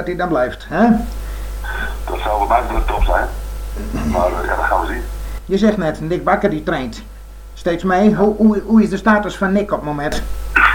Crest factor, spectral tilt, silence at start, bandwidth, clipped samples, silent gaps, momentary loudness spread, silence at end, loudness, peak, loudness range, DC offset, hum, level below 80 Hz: 16 dB; -6.5 dB/octave; 0 s; 19 kHz; under 0.1%; none; 14 LU; 0 s; -17 LUFS; 0 dBFS; 4 LU; under 0.1%; none; -26 dBFS